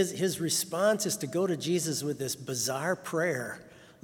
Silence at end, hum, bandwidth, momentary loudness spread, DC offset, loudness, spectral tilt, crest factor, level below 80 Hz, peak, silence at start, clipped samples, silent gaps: 0.1 s; none; 18 kHz; 7 LU; under 0.1%; -30 LUFS; -3.5 dB/octave; 16 dB; -72 dBFS; -14 dBFS; 0 s; under 0.1%; none